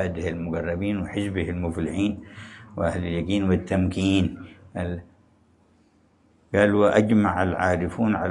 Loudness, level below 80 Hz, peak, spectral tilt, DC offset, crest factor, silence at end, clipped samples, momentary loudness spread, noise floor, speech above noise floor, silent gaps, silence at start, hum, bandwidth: -24 LUFS; -50 dBFS; -4 dBFS; -7 dB/octave; under 0.1%; 20 dB; 0 s; under 0.1%; 15 LU; -61 dBFS; 37 dB; none; 0 s; none; 11 kHz